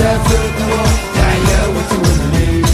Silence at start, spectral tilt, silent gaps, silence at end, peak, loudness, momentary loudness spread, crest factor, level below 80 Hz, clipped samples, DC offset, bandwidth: 0 s; -5 dB/octave; none; 0 s; 0 dBFS; -13 LUFS; 2 LU; 12 dB; -18 dBFS; under 0.1%; under 0.1%; 14 kHz